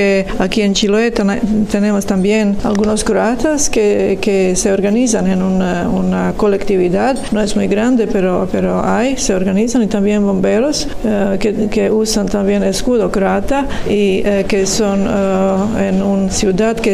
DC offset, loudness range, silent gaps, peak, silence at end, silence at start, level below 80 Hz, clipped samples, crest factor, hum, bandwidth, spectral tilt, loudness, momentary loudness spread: under 0.1%; 1 LU; none; 0 dBFS; 0 s; 0 s; -30 dBFS; under 0.1%; 14 dB; none; 14 kHz; -5 dB/octave; -14 LUFS; 2 LU